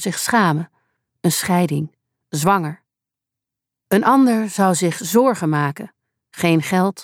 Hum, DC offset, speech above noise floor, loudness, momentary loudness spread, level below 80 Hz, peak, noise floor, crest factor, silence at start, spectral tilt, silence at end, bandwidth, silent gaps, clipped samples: none; under 0.1%; 68 dB; -18 LUFS; 13 LU; -64 dBFS; -2 dBFS; -86 dBFS; 16 dB; 0 s; -5 dB/octave; 0 s; 18.5 kHz; none; under 0.1%